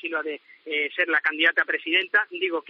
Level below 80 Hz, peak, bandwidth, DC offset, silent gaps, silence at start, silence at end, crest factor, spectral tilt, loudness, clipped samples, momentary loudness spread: under -90 dBFS; -8 dBFS; 6.2 kHz; under 0.1%; none; 0.05 s; 0.1 s; 18 dB; 3.5 dB/octave; -23 LUFS; under 0.1%; 10 LU